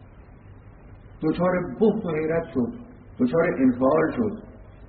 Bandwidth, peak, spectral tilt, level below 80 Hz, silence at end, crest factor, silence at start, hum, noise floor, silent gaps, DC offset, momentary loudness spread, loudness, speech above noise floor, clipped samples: 4.5 kHz; -8 dBFS; -7.5 dB/octave; -50 dBFS; 0.05 s; 16 dB; 0 s; none; -46 dBFS; none; under 0.1%; 9 LU; -24 LUFS; 24 dB; under 0.1%